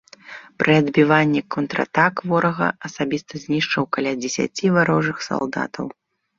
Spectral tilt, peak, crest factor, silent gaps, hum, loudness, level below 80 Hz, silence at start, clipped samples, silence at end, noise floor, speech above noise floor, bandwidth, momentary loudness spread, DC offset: -5.5 dB/octave; -2 dBFS; 20 dB; none; none; -20 LUFS; -60 dBFS; 0.25 s; under 0.1%; 0.45 s; -41 dBFS; 21 dB; 7.8 kHz; 12 LU; under 0.1%